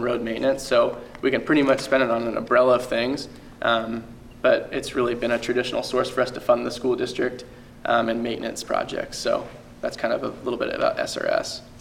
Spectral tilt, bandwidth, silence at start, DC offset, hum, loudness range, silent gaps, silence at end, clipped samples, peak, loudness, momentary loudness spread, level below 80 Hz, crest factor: -4.5 dB/octave; 16 kHz; 0 s; under 0.1%; none; 5 LU; none; 0 s; under 0.1%; -6 dBFS; -24 LUFS; 11 LU; -50 dBFS; 18 dB